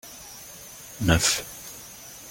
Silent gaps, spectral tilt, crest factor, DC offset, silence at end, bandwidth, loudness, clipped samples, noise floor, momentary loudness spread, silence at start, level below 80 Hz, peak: none; -3 dB/octave; 26 dB; under 0.1%; 0 s; 17 kHz; -23 LUFS; under 0.1%; -43 dBFS; 20 LU; 0.05 s; -44 dBFS; -4 dBFS